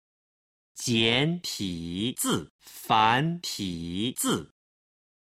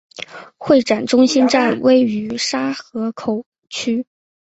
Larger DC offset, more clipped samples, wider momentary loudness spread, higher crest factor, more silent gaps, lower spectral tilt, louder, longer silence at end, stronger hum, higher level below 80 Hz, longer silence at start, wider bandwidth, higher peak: neither; neither; second, 10 LU vs 18 LU; first, 22 dB vs 16 dB; about the same, 2.50-2.59 s vs 3.46-3.52 s; about the same, -3.5 dB/octave vs -4 dB/octave; second, -27 LUFS vs -17 LUFS; first, 0.8 s vs 0.45 s; neither; about the same, -58 dBFS vs -58 dBFS; first, 0.75 s vs 0.2 s; first, 16 kHz vs 8.2 kHz; second, -6 dBFS vs -2 dBFS